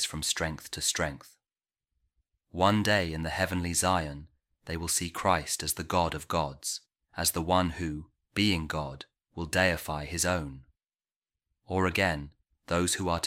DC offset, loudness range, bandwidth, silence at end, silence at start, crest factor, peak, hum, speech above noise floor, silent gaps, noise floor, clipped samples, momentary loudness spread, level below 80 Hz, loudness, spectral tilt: under 0.1%; 2 LU; 16.5 kHz; 0 s; 0 s; 22 dB; -8 dBFS; none; over 60 dB; 11.16-11.22 s; under -90 dBFS; under 0.1%; 14 LU; -50 dBFS; -29 LUFS; -3.5 dB/octave